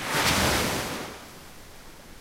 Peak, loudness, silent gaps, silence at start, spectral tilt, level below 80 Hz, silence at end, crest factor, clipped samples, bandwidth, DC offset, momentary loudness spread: -10 dBFS; -25 LUFS; none; 0 s; -2.5 dB/octave; -44 dBFS; 0 s; 18 dB; under 0.1%; 16 kHz; under 0.1%; 25 LU